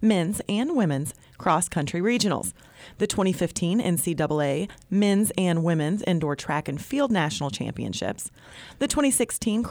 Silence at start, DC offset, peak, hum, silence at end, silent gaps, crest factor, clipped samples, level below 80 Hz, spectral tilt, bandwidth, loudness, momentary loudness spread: 0 s; under 0.1%; -10 dBFS; none; 0 s; none; 14 dB; under 0.1%; -52 dBFS; -5 dB/octave; over 20 kHz; -25 LUFS; 8 LU